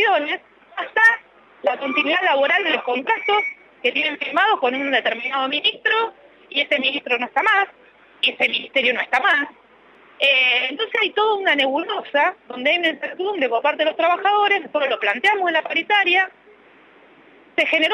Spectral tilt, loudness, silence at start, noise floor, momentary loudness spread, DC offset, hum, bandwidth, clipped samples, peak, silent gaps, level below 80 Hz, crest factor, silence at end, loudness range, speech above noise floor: -2.5 dB/octave; -19 LUFS; 0 s; -50 dBFS; 8 LU; under 0.1%; none; 13.5 kHz; under 0.1%; -6 dBFS; none; -74 dBFS; 14 dB; 0 s; 2 LU; 31 dB